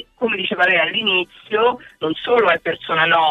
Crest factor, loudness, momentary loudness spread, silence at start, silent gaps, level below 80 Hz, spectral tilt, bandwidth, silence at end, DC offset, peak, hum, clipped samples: 16 dB; -17 LUFS; 8 LU; 0.2 s; none; -58 dBFS; -5.5 dB/octave; 7.6 kHz; 0 s; under 0.1%; -2 dBFS; none; under 0.1%